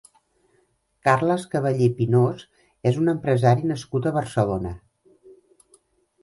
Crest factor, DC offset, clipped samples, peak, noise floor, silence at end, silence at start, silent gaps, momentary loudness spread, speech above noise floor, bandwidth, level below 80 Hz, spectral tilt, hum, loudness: 20 dB; under 0.1%; under 0.1%; -4 dBFS; -66 dBFS; 1.45 s; 1.05 s; none; 7 LU; 45 dB; 11.5 kHz; -52 dBFS; -7.5 dB/octave; none; -22 LUFS